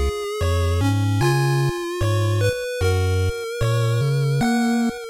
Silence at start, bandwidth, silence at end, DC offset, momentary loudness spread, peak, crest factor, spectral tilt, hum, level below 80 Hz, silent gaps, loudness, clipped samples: 0 s; 16.5 kHz; 0 s; under 0.1%; 5 LU; -10 dBFS; 10 dB; -6 dB/octave; none; -36 dBFS; none; -21 LUFS; under 0.1%